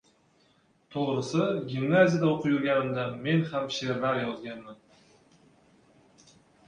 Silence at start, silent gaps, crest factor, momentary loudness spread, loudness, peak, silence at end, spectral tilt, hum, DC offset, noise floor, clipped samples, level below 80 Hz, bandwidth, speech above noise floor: 0.9 s; none; 22 dB; 13 LU; -27 LUFS; -8 dBFS; 1.95 s; -6.5 dB/octave; none; under 0.1%; -66 dBFS; under 0.1%; -68 dBFS; 9.8 kHz; 38 dB